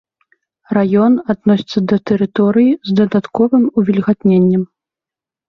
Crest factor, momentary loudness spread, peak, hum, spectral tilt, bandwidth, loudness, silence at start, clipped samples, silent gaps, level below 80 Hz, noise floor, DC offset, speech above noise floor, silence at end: 12 dB; 4 LU; -2 dBFS; none; -9 dB/octave; 6.2 kHz; -14 LUFS; 0.7 s; under 0.1%; none; -54 dBFS; -88 dBFS; under 0.1%; 75 dB; 0.85 s